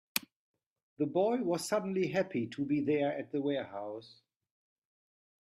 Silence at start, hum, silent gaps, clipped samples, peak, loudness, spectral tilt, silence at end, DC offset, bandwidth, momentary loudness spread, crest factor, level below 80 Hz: 0.15 s; none; 0.36-0.54 s, 0.66-0.76 s, 0.83-0.96 s; under 0.1%; -12 dBFS; -34 LUFS; -5 dB/octave; 1.45 s; under 0.1%; 15 kHz; 9 LU; 24 dB; -78 dBFS